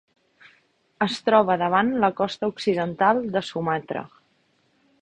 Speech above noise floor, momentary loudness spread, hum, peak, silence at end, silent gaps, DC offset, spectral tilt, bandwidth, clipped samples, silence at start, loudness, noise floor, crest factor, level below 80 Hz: 43 dB; 8 LU; none; -4 dBFS; 0.95 s; none; under 0.1%; -6 dB/octave; 10.5 kHz; under 0.1%; 1 s; -23 LUFS; -66 dBFS; 20 dB; -62 dBFS